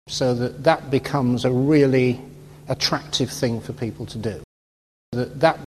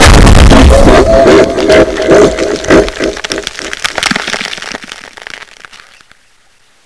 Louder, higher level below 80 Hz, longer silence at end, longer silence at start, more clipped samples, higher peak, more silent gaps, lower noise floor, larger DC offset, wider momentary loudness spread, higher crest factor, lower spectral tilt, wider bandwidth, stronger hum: second, -22 LUFS vs -7 LUFS; second, -50 dBFS vs -12 dBFS; second, 0.1 s vs 1.4 s; about the same, 0.05 s vs 0 s; second, under 0.1% vs 7%; about the same, -2 dBFS vs 0 dBFS; first, 4.44-5.12 s vs none; first, under -90 dBFS vs -48 dBFS; neither; second, 13 LU vs 21 LU; first, 20 dB vs 8 dB; about the same, -5.5 dB/octave vs -5 dB/octave; first, 13 kHz vs 11 kHz; neither